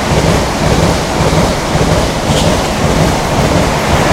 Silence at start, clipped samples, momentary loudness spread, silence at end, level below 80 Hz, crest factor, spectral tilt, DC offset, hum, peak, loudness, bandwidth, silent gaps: 0 s; under 0.1%; 1 LU; 0 s; -20 dBFS; 10 dB; -5 dB/octave; under 0.1%; none; 0 dBFS; -11 LUFS; 16.5 kHz; none